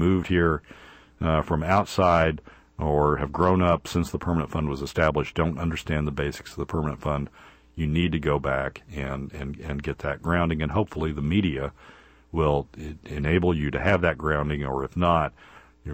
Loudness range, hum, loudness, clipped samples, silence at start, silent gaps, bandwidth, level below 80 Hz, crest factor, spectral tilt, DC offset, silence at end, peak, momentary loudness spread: 5 LU; none; -25 LUFS; under 0.1%; 0 s; none; 16 kHz; -38 dBFS; 20 dB; -7 dB/octave; under 0.1%; 0 s; -6 dBFS; 11 LU